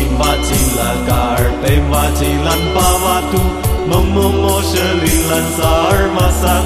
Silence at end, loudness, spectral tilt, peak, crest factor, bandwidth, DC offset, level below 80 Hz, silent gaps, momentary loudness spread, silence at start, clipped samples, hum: 0 s; -13 LUFS; -4.5 dB/octave; 0 dBFS; 12 dB; 14.5 kHz; under 0.1%; -18 dBFS; none; 3 LU; 0 s; under 0.1%; none